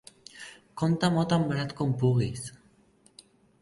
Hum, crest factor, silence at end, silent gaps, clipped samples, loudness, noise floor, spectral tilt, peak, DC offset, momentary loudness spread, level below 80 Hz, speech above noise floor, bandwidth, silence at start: none; 18 dB; 1.05 s; none; under 0.1%; -27 LUFS; -62 dBFS; -6.5 dB/octave; -10 dBFS; under 0.1%; 20 LU; -58 dBFS; 36 dB; 11.5 kHz; 0.35 s